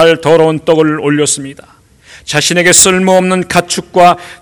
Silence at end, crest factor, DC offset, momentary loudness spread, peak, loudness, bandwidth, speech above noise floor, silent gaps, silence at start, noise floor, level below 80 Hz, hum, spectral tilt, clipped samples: 0.05 s; 10 dB; under 0.1%; 10 LU; 0 dBFS; -9 LUFS; over 20 kHz; 30 dB; none; 0 s; -39 dBFS; -44 dBFS; none; -3 dB/octave; 3%